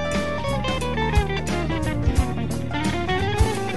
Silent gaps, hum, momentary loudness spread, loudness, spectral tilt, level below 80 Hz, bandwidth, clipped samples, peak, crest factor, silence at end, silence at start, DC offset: none; none; 3 LU; -24 LUFS; -5.5 dB/octave; -30 dBFS; 12.5 kHz; under 0.1%; -8 dBFS; 16 dB; 0 s; 0 s; 2%